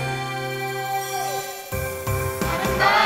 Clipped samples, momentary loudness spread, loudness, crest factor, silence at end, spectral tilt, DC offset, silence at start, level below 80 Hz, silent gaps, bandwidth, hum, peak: under 0.1%; 8 LU; -25 LUFS; 18 dB; 0 s; -4 dB/octave; under 0.1%; 0 s; -40 dBFS; none; 16.5 kHz; none; -4 dBFS